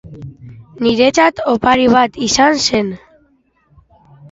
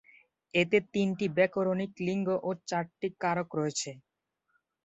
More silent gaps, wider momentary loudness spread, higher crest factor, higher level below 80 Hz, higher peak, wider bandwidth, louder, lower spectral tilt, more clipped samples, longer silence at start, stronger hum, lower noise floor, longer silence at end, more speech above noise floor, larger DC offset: neither; first, 23 LU vs 7 LU; about the same, 16 dB vs 20 dB; first, -46 dBFS vs -72 dBFS; first, 0 dBFS vs -12 dBFS; about the same, 8 kHz vs 8.4 kHz; first, -13 LUFS vs -31 LUFS; second, -3.5 dB/octave vs -5 dB/octave; neither; second, 0.05 s vs 0.55 s; neither; second, -56 dBFS vs -77 dBFS; first, 1.35 s vs 0.85 s; second, 43 dB vs 47 dB; neither